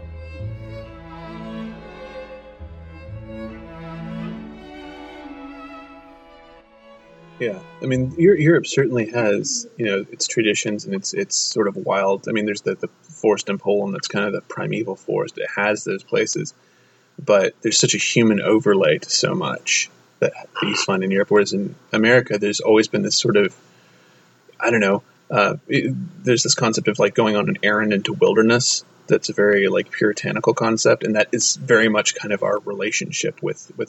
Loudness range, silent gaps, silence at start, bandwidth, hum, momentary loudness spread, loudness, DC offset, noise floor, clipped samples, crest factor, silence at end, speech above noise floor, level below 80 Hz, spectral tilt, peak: 17 LU; none; 0 s; 8.4 kHz; none; 20 LU; -19 LUFS; under 0.1%; -53 dBFS; under 0.1%; 18 dB; 0.05 s; 34 dB; -52 dBFS; -3.5 dB/octave; -2 dBFS